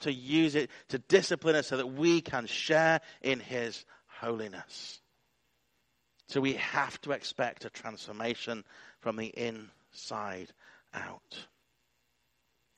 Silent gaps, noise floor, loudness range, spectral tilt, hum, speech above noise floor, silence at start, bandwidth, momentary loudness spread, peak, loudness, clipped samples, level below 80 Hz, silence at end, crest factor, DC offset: none; -77 dBFS; 12 LU; -4.5 dB/octave; none; 45 dB; 0 s; 10 kHz; 19 LU; -10 dBFS; -32 LUFS; under 0.1%; -74 dBFS; 1.35 s; 24 dB; under 0.1%